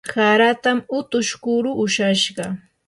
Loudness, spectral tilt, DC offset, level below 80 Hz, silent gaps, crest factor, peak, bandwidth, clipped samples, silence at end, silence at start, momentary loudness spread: -19 LUFS; -3.5 dB/octave; under 0.1%; -62 dBFS; none; 16 dB; -4 dBFS; 11.5 kHz; under 0.1%; 0.3 s; 0.05 s; 8 LU